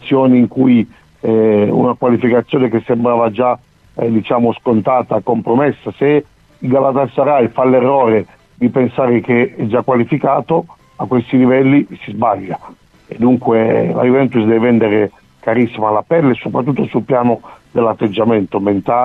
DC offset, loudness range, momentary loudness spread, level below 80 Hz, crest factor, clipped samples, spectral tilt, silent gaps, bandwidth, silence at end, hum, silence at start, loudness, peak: under 0.1%; 2 LU; 7 LU; -52 dBFS; 12 dB; under 0.1%; -10 dB/octave; none; 4 kHz; 0 s; none; 0 s; -14 LUFS; -2 dBFS